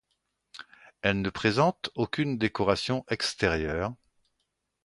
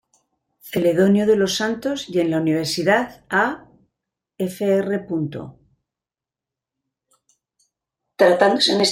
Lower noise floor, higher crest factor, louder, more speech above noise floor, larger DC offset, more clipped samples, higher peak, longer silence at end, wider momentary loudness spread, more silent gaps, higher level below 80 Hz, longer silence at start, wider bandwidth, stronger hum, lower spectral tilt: second, -80 dBFS vs -89 dBFS; about the same, 22 dB vs 18 dB; second, -28 LUFS vs -19 LUFS; second, 52 dB vs 70 dB; neither; neither; second, -8 dBFS vs -2 dBFS; first, 0.9 s vs 0 s; second, 9 LU vs 12 LU; neither; first, -50 dBFS vs -60 dBFS; about the same, 0.55 s vs 0.65 s; second, 11.5 kHz vs 16.5 kHz; neither; about the same, -5 dB/octave vs -4.5 dB/octave